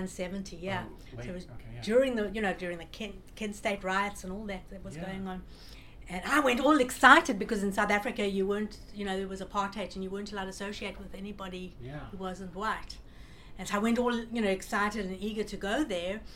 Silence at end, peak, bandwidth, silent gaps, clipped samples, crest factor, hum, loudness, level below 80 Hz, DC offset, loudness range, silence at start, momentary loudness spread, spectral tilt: 0 s; -4 dBFS; 17 kHz; none; under 0.1%; 28 dB; none; -30 LUFS; -50 dBFS; under 0.1%; 12 LU; 0 s; 17 LU; -4.5 dB/octave